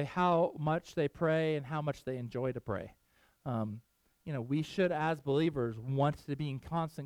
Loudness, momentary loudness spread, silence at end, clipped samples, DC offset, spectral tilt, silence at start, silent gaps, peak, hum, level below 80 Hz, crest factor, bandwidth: -34 LUFS; 10 LU; 0 s; under 0.1%; under 0.1%; -7.5 dB/octave; 0 s; none; -18 dBFS; none; -64 dBFS; 16 dB; 14 kHz